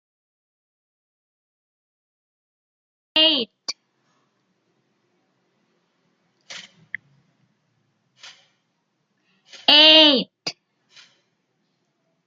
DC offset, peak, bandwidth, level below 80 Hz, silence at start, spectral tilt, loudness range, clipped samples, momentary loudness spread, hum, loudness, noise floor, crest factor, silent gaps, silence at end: under 0.1%; 0 dBFS; 13.5 kHz; -80 dBFS; 3.15 s; -2 dB/octave; 9 LU; under 0.1%; 29 LU; none; -14 LUFS; -72 dBFS; 24 dB; none; 1.75 s